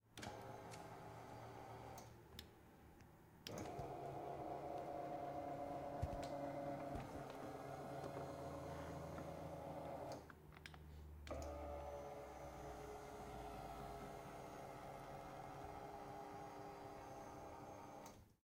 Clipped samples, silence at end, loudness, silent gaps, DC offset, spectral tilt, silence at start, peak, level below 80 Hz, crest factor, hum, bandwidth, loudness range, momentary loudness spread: under 0.1%; 0.15 s; -53 LUFS; none; under 0.1%; -6 dB/octave; 0.05 s; -30 dBFS; -66 dBFS; 22 dB; none; 16 kHz; 6 LU; 10 LU